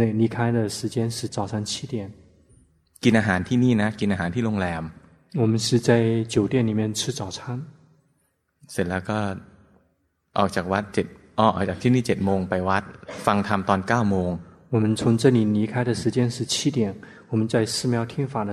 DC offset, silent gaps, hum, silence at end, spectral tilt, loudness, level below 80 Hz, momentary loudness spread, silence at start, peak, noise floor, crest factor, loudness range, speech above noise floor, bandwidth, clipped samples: under 0.1%; none; none; 0 s; -5.5 dB/octave; -23 LUFS; -54 dBFS; 11 LU; 0 s; -2 dBFS; -70 dBFS; 20 dB; 6 LU; 47 dB; 14 kHz; under 0.1%